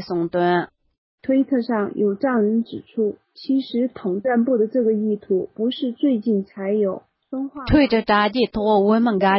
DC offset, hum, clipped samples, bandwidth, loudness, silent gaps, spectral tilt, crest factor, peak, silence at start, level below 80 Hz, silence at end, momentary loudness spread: under 0.1%; none; under 0.1%; 5.8 kHz; -21 LUFS; 0.98-1.18 s; -11 dB/octave; 16 dB; -4 dBFS; 0 s; -44 dBFS; 0 s; 9 LU